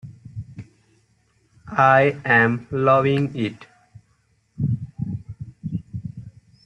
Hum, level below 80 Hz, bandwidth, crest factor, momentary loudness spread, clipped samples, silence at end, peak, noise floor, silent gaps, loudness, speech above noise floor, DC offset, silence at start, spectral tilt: none; -54 dBFS; 8.4 kHz; 20 dB; 22 LU; under 0.1%; 0.35 s; -2 dBFS; -64 dBFS; none; -20 LUFS; 46 dB; under 0.1%; 0.05 s; -8 dB/octave